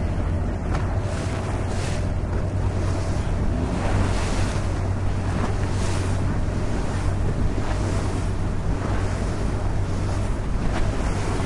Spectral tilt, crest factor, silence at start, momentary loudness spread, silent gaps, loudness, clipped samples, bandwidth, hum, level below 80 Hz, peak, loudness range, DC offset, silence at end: -6.5 dB/octave; 12 dB; 0 s; 2 LU; none; -26 LUFS; under 0.1%; 11.5 kHz; none; -28 dBFS; -10 dBFS; 1 LU; under 0.1%; 0 s